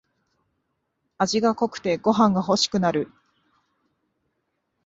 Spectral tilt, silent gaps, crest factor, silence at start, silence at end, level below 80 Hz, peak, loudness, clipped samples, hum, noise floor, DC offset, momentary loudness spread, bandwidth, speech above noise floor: -5 dB/octave; none; 20 dB; 1.2 s; 1.8 s; -62 dBFS; -4 dBFS; -22 LUFS; under 0.1%; none; -76 dBFS; under 0.1%; 7 LU; 8 kHz; 54 dB